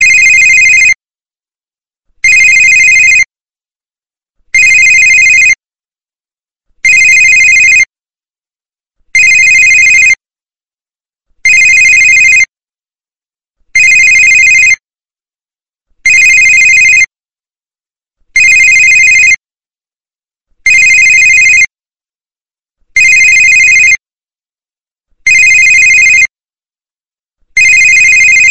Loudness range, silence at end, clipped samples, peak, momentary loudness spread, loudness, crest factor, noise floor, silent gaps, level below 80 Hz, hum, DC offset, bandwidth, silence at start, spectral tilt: 2 LU; 0 s; 0.2%; 0 dBFS; 9 LU; -2 LUFS; 8 dB; under -90 dBFS; 3.42-3.46 s; -40 dBFS; none; under 0.1%; 11.5 kHz; 0 s; 2.5 dB/octave